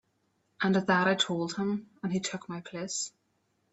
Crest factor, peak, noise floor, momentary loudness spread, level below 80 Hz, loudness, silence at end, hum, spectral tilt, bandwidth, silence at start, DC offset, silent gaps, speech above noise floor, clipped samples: 20 dB; -12 dBFS; -75 dBFS; 13 LU; -72 dBFS; -30 LUFS; 0.65 s; none; -4 dB/octave; 8.4 kHz; 0.6 s; under 0.1%; none; 45 dB; under 0.1%